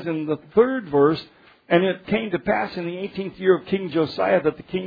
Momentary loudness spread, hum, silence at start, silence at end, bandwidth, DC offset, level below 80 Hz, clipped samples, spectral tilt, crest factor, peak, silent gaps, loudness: 10 LU; none; 0 s; 0 s; 5 kHz; under 0.1%; -56 dBFS; under 0.1%; -9 dB/octave; 18 dB; -4 dBFS; none; -22 LUFS